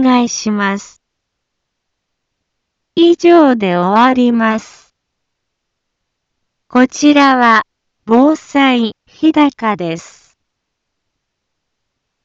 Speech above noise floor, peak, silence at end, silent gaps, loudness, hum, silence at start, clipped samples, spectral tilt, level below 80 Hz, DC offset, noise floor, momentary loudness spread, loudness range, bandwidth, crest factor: 63 dB; 0 dBFS; 2.25 s; none; -12 LUFS; none; 0 s; under 0.1%; -4.5 dB/octave; -58 dBFS; under 0.1%; -73 dBFS; 12 LU; 5 LU; 7.8 kHz; 14 dB